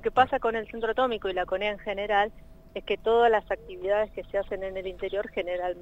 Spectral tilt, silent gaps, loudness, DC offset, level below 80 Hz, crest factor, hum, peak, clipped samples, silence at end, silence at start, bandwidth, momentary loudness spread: -5.5 dB/octave; none; -28 LUFS; under 0.1%; -50 dBFS; 20 dB; none; -8 dBFS; under 0.1%; 0 s; 0 s; 7.8 kHz; 10 LU